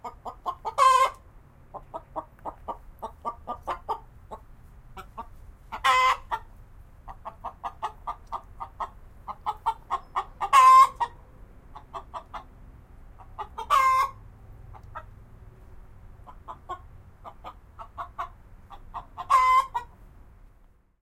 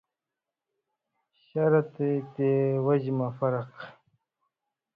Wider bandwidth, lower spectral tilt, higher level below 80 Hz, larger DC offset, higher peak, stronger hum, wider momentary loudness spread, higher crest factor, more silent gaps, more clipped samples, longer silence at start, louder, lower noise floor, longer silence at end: first, 16 kHz vs 5.2 kHz; second, -2 dB/octave vs -11.5 dB/octave; first, -50 dBFS vs -72 dBFS; neither; first, -6 dBFS vs -12 dBFS; neither; first, 26 LU vs 14 LU; about the same, 22 dB vs 18 dB; neither; neither; second, 0.05 s vs 1.55 s; first, -24 LUFS vs -27 LUFS; second, -58 dBFS vs -89 dBFS; about the same, 1.15 s vs 1.05 s